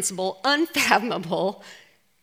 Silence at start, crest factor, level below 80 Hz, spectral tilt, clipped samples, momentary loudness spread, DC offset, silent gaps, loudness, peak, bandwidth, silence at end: 0 s; 24 dB; -68 dBFS; -2.5 dB/octave; under 0.1%; 8 LU; under 0.1%; none; -23 LUFS; 0 dBFS; 16.5 kHz; 0.45 s